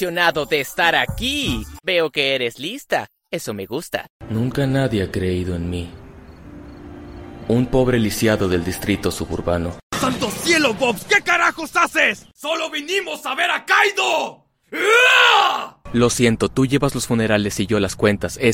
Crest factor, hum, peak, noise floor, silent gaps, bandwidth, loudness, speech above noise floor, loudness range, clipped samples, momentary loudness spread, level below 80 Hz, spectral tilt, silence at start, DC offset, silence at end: 20 dB; none; 0 dBFS; -40 dBFS; 4.10-4.20 s, 9.83-9.90 s; 16.5 kHz; -18 LUFS; 21 dB; 8 LU; under 0.1%; 12 LU; -40 dBFS; -4 dB/octave; 0 s; under 0.1%; 0 s